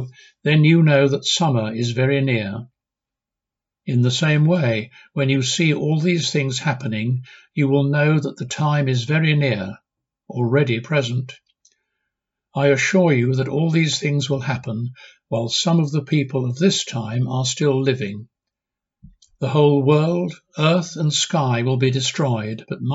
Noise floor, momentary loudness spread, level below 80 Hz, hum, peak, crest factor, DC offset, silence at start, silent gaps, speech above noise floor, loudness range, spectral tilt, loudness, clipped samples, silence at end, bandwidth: -87 dBFS; 11 LU; -62 dBFS; none; -4 dBFS; 16 dB; under 0.1%; 0 s; none; 68 dB; 3 LU; -5.5 dB/octave; -19 LUFS; under 0.1%; 0 s; 8 kHz